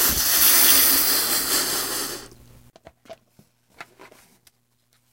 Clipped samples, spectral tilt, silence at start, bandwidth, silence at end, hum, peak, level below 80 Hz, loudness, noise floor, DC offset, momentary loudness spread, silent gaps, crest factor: under 0.1%; 0.5 dB/octave; 0 s; 16.5 kHz; 1.3 s; none; -2 dBFS; -48 dBFS; -16 LUFS; -66 dBFS; under 0.1%; 15 LU; none; 20 dB